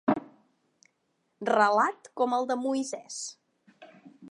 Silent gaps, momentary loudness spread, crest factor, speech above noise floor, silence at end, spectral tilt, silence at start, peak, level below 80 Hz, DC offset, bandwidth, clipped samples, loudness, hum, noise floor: none; 14 LU; 22 dB; 48 dB; 0.05 s; -3.5 dB/octave; 0.05 s; -8 dBFS; -80 dBFS; under 0.1%; 11.5 kHz; under 0.1%; -28 LUFS; none; -76 dBFS